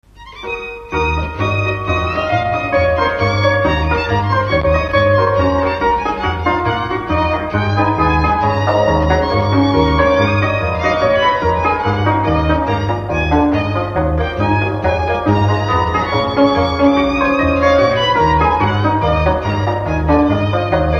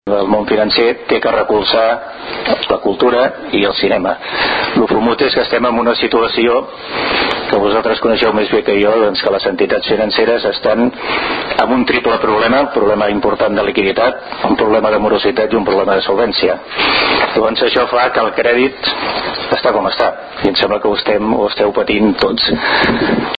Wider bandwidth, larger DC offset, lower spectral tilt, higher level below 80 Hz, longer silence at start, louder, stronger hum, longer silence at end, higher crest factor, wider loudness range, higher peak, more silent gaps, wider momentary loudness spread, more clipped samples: first, 7 kHz vs 5.2 kHz; neither; about the same, -7 dB/octave vs -7 dB/octave; first, -26 dBFS vs -42 dBFS; first, 0.2 s vs 0.05 s; about the same, -15 LUFS vs -13 LUFS; neither; about the same, 0 s vs 0.05 s; about the same, 14 dB vs 12 dB; about the same, 2 LU vs 1 LU; about the same, 0 dBFS vs 0 dBFS; neither; about the same, 5 LU vs 4 LU; neither